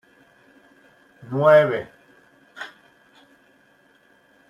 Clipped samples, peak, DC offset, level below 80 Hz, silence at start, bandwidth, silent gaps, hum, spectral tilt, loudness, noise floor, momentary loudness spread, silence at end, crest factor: under 0.1%; -4 dBFS; under 0.1%; -70 dBFS; 1.3 s; 7.2 kHz; none; none; -7 dB/octave; -18 LUFS; -58 dBFS; 24 LU; 1.8 s; 22 dB